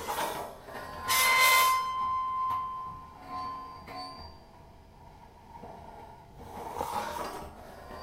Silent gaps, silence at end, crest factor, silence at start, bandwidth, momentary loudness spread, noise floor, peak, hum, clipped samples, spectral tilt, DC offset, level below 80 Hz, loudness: none; 0 s; 22 dB; 0 s; 16 kHz; 26 LU; -53 dBFS; -10 dBFS; none; under 0.1%; -0.5 dB/octave; under 0.1%; -56 dBFS; -28 LUFS